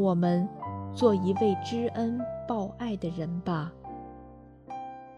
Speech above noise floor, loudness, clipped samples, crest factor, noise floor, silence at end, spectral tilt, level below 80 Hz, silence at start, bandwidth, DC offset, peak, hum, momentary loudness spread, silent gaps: 22 dB; -30 LUFS; under 0.1%; 20 dB; -50 dBFS; 0 s; -8 dB/octave; -58 dBFS; 0 s; 11 kHz; under 0.1%; -10 dBFS; none; 18 LU; none